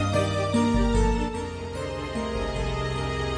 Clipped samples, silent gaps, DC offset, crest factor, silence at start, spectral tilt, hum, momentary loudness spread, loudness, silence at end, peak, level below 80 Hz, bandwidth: under 0.1%; none; under 0.1%; 14 dB; 0 s; -6 dB/octave; none; 9 LU; -27 LUFS; 0 s; -10 dBFS; -32 dBFS; 11 kHz